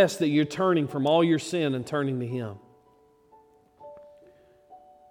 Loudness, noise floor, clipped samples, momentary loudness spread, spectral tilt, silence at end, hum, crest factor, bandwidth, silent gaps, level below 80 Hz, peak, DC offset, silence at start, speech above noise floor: -25 LUFS; -61 dBFS; under 0.1%; 19 LU; -6 dB/octave; 0.35 s; none; 20 dB; 15.5 kHz; none; -72 dBFS; -8 dBFS; under 0.1%; 0 s; 36 dB